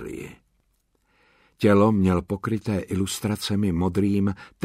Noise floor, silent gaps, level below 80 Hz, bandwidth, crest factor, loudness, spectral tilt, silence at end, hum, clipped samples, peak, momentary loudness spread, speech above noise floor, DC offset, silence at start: -69 dBFS; none; -50 dBFS; 15.5 kHz; 18 dB; -23 LUFS; -6.5 dB/octave; 0.2 s; none; under 0.1%; -6 dBFS; 9 LU; 46 dB; under 0.1%; 0 s